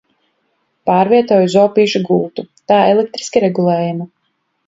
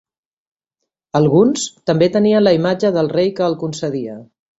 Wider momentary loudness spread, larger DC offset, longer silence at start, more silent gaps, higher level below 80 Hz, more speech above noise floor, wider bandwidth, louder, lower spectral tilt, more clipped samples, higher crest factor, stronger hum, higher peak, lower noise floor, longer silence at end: about the same, 12 LU vs 10 LU; neither; second, 0.85 s vs 1.15 s; neither; about the same, -60 dBFS vs -56 dBFS; second, 54 dB vs 64 dB; about the same, 7.8 kHz vs 8.2 kHz; about the same, -14 LUFS vs -16 LUFS; about the same, -6 dB/octave vs -6 dB/octave; neither; about the same, 14 dB vs 16 dB; neither; about the same, 0 dBFS vs -2 dBFS; second, -67 dBFS vs -79 dBFS; first, 0.6 s vs 0.35 s